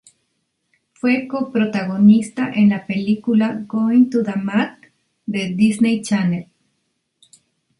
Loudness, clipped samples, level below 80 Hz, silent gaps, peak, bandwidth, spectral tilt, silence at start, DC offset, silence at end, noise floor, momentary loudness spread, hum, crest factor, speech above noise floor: -18 LUFS; under 0.1%; -62 dBFS; none; -2 dBFS; 11.5 kHz; -6.5 dB/octave; 1.05 s; under 0.1%; 1.4 s; -71 dBFS; 9 LU; none; 16 dB; 54 dB